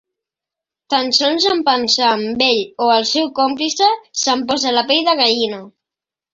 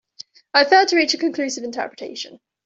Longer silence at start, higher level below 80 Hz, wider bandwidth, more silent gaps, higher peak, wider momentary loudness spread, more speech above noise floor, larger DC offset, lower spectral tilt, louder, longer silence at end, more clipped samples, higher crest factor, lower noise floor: first, 0.9 s vs 0.55 s; first, -62 dBFS vs -70 dBFS; about the same, 7.8 kHz vs 8 kHz; neither; about the same, 0 dBFS vs -2 dBFS; second, 5 LU vs 17 LU; first, 71 dB vs 26 dB; neither; about the same, -1.5 dB/octave vs -1 dB/octave; first, -15 LUFS vs -18 LUFS; first, 0.65 s vs 0.3 s; neither; about the same, 16 dB vs 18 dB; first, -87 dBFS vs -45 dBFS